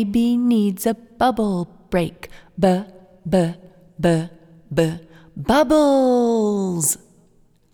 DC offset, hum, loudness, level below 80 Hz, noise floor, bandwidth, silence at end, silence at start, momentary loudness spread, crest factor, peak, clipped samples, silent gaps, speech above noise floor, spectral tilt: under 0.1%; none; -20 LUFS; -46 dBFS; -56 dBFS; 19 kHz; 0.8 s; 0 s; 19 LU; 18 dB; -2 dBFS; under 0.1%; none; 37 dB; -5.5 dB/octave